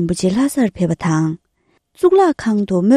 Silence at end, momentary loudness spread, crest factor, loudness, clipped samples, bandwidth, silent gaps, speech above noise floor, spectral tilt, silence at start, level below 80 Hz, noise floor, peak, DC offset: 0 s; 6 LU; 14 dB; -16 LUFS; under 0.1%; 14.5 kHz; none; 48 dB; -7 dB/octave; 0 s; -46 dBFS; -63 dBFS; 0 dBFS; under 0.1%